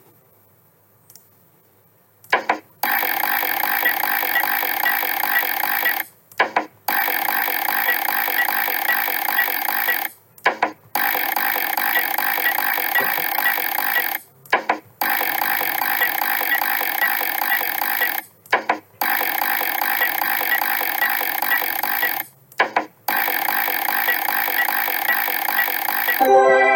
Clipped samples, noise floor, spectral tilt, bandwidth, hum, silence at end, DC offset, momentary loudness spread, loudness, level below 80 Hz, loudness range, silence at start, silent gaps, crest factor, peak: under 0.1%; -56 dBFS; -1 dB/octave; 18 kHz; none; 0 s; under 0.1%; 4 LU; -19 LUFS; -74 dBFS; 1 LU; 2.3 s; none; 18 dB; -2 dBFS